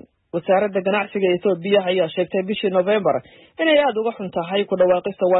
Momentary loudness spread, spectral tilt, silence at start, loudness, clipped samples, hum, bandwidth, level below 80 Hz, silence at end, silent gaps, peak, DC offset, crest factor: 7 LU; -10.5 dB/octave; 0.35 s; -20 LUFS; under 0.1%; none; 4.1 kHz; -64 dBFS; 0 s; none; -6 dBFS; under 0.1%; 14 dB